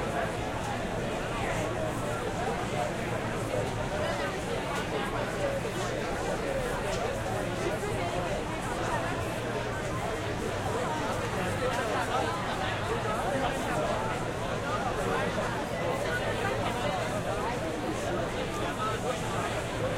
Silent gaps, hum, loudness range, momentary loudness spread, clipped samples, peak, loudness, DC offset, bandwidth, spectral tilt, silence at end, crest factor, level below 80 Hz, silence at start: none; none; 2 LU; 3 LU; under 0.1%; -16 dBFS; -31 LUFS; under 0.1%; 16.5 kHz; -5 dB/octave; 0 s; 14 dB; -44 dBFS; 0 s